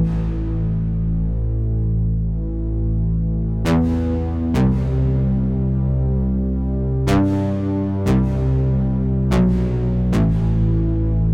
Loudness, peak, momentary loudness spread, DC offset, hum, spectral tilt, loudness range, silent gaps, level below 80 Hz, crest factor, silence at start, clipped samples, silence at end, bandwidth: -20 LUFS; -6 dBFS; 4 LU; under 0.1%; none; -9 dB/octave; 2 LU; none; -24 dBFS; 12 dB; 0 s; under 0.1%; 0 s; 10.5 kHz